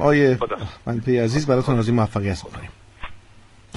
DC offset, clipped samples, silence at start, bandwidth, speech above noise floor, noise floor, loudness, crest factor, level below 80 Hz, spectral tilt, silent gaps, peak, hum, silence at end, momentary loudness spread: under 0.1%; under 0.1%; 0 s; 11.5 kHz; 29 dB; -48 dBFS; -21 LUFS; 18 dB; -44 dBFS; -7 dB/octave; none; -4 dBFS; none; 0.6 s; 22 LU